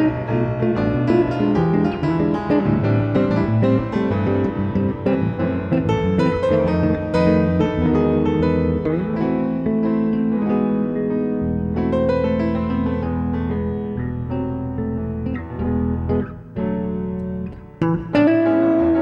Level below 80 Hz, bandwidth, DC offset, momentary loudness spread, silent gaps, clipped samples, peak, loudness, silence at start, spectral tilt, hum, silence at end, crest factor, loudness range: -40 dBFS; 7.4 kHz; under 0.1%; 8 LU; none; under 0.1%; -4 dBFS; -20 LUFS; 0 s; -9.5 dB/octave; none; 0 s; 14 dB; 6 LU